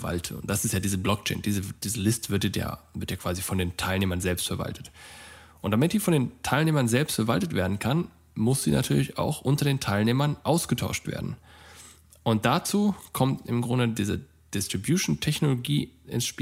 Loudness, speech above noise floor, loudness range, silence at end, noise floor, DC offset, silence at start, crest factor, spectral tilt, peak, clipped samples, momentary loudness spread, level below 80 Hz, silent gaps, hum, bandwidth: -27 LUFS; 25 dB; 3 LU; 0 s; -51 dBFS; under 0.1%; 0 s; 20 dB; -5 dB/octave; -8 dBFS; under 0.1%; 11 LU; -50 dBFS; none; none; 16 kHz